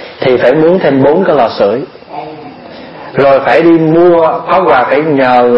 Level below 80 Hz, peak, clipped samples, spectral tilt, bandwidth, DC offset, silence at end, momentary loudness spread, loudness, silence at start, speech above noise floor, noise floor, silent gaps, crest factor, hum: -46 dBFS; 0 dBFS; 0.3%; -8.5 dB/octave; 5.8 kHz; under 0.1%; 0 s; 20 LU; -8 LUFS; 0 s; 21 dB; -28 dBFS; none; 8 dB; none